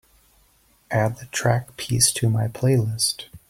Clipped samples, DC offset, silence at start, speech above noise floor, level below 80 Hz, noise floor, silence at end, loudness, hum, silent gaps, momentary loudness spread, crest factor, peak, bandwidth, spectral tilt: under 0.1%; under 0.1%; 0.9 s; 38 dB; -52 dBFS; -60 dBFS; 0.15 s; -22 LUFS; none; none; 7 LU; 20 dB; -2 dBFS; 16.5 kHz; -4 dB/octave